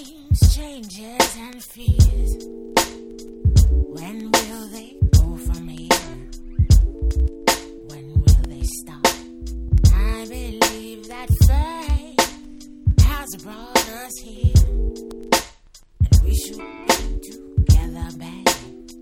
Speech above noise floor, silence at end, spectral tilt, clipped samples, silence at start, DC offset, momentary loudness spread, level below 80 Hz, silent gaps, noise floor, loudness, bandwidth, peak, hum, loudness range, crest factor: 26 dB; 0.05 s; -4.5 dB/octave; under 0.1%; 0 s; under 0.1%; 17 LU; -22 dBFS; none; -48 dBFS; -20 LUFS; 18 kHz; -2 dBFS; none; 1 LU; 18 dB